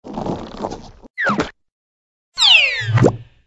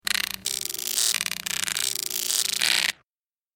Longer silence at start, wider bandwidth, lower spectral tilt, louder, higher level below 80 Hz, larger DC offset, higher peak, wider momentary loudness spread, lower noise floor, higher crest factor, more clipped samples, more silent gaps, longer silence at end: about the same, 0.05 s vs 0.05 s; second, 11 kHz vs 17 kHz; first, -4 dB/octave vs 2 dB/octave; first, -14 LUFS vs -24 LUFS; first, -44 dBFS vs -64 dBFS; neither; about the same, 0 dBFS vs -2 dBFS; first, 21 LU vs 6 LU; about the same, under -90 dBFS vs under -90 dBFS; second, 18 dB vs 26 dB; neither; first, 1.10-1.14 s, 1.72-2.32 s vs none; second, 0.25 s vs 0.65 s